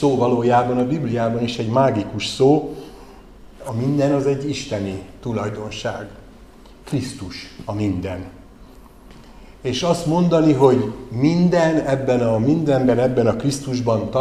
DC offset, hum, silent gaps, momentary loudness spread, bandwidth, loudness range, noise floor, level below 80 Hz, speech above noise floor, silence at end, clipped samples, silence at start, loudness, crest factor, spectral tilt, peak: 0.2%; none; none; 14 LU; 13.5 kHz; 11 LU; -43 dBFS; -46 dBFS; 25 dB; 0 s; under 0.1%; 0 s; -19 LUFS; 20 dB; -6.5 dB/octave; 0 dBFS